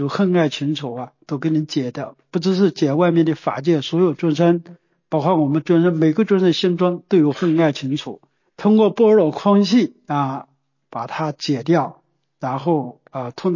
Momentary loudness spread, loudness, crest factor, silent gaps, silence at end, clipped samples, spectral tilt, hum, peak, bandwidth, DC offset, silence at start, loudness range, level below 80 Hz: 13 LU; -18 LUFS; 14 dB; none; 0 s; under 0.1%; -7 dB/octave; none; -4 dBFS; 7.4 kHz; under 0.1%; 0 s; 4 LU; -70 dBFS